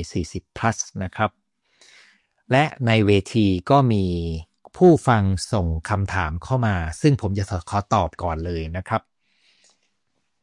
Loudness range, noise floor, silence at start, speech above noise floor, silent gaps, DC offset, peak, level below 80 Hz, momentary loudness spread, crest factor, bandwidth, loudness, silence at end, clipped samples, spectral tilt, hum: 5 LU; -75 dBFS; 0 s; 54 dB; none; under 0.1%; -4 dBFS; -44 dBFS; 10 LU; 18 dB; 11.5 kHz; -21 LUFS; 1.45 s; under 0.1%; -6.5 dB/octave; none